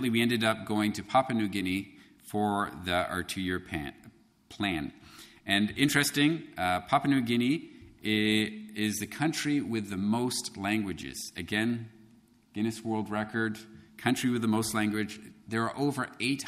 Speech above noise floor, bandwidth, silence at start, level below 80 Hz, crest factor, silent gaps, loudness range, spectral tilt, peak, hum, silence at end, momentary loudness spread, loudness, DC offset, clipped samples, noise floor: 31 dB; 15.5 kHz; 0 s; -60 dBFS; 22 dB; none; 5 LU; -4.5 dB/octave; -10 dBFS; none; 0 s; 12 LU; -30 LUFS; under 0.1%; under 0.1%; -60 dBFS